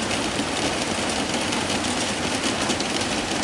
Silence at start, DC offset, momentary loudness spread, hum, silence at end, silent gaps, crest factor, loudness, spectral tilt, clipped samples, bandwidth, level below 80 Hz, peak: 0 s; under 0.1%; 1 LU; none; 0 s; none; 18 dB; -23 LUFS; -2.5 dB/octave; under 0.1%; 11.5 kHz; -48 dBFS; -8 dBFS